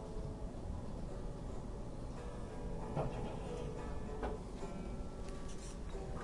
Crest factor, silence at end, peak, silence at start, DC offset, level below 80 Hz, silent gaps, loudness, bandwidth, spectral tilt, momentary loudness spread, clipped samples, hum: 16 dB; 0 s; -26 dBFS; 0 s; under 0.1%; -46 dBFS; none; -46 LUFS; 11.5 kHz; -6.5 dB/octave; 6 LU; under 0.1%; none